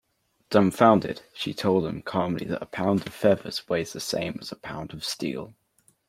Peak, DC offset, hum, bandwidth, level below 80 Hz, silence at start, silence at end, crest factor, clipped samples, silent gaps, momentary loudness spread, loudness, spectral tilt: -2 dBFS; under 0.1%; none; 16 kHz; -60 dBFS; 0.5 s; 0.55 s; 24 dB; under 0.1%; none; 16 LU; -26 LUFS; -5.5 dB/octave